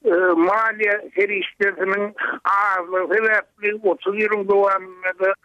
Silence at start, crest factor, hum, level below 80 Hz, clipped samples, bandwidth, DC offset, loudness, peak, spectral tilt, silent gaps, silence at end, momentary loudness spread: 0.05 s; 12 dB; none; -68 dBFS; under 0.1%; 7.4 kHz; under 0.1%; -20 LUFS; -8 dBFS; -6 dB/octave; none; 0.1 s; 5 LU